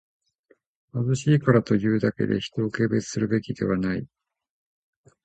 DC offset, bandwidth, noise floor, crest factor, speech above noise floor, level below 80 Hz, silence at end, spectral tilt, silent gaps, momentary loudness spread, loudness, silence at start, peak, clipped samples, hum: under 0.1%; 9 kHz; -64 dBFS; 20 dB; 41 dB; -54 dBFS; 1.2 s; -7 dB/octave; none; 8 LU; -24 LUFS; 0.95 s; -4 dBFS; under 0.1%; none